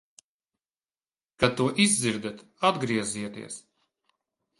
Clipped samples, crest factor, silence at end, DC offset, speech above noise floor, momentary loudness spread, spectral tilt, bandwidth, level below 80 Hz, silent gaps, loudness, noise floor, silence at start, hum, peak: under 0.1%; 24 dB; 1 s; under 0.1%; over 63 dB; 17 LU; -3.5 dB/octave; 11.5 kHz; -60 dBFS; none; -26 LUFS; under -90 dBFS; 1.4 s; none; -4 dBFS